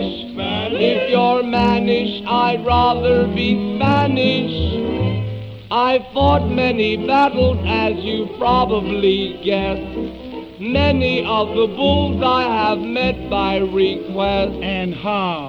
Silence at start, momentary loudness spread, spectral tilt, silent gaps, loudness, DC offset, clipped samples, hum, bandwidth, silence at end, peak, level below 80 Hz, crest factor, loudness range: 0 s; 7 LU; -7.5 dB/octave; none; -18 LUFS; under 0.1%; under 0.1%; none; 7.2 kHz; 0 s; -2 dBFS; -34 dBFS; 16 dB; 2 LU